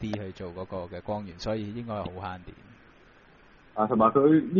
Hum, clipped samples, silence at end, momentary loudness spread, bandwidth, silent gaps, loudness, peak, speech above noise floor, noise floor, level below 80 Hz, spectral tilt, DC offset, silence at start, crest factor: none; under 0.1%; 0 s; 18 LU; 6.8 kHz; none; -28 LUFS; -8 dBFS; 29 dB; -56 dBFS; -56 dBFS; -7 dB/octave; under 0.1%; 0 s; 20 dB